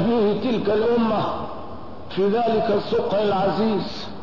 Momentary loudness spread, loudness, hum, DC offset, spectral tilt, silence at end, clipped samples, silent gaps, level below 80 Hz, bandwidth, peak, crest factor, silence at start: 12 LU; -22 LUFS; none; 2%; -7.5 dB/octave; 0 s; under 0.1%; none; -50 dBFS; 6 kHz; -10 dBFS; 10 dB; 0 s